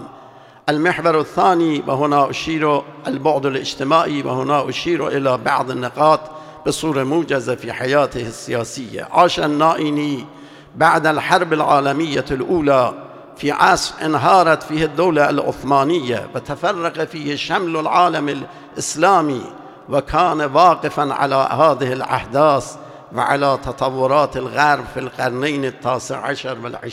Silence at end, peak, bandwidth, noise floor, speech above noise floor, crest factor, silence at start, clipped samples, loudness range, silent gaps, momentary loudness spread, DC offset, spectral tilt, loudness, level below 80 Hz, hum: 0 s; 0 dBFS; 15.5 kHz; -42 dBFS; 25 dB; 18 dB; 0 s; under 0.1%; 3 LU; none; 10 LU; under 0.1%; -5 dB/octave; -17 LUFS; -48 dBFS; none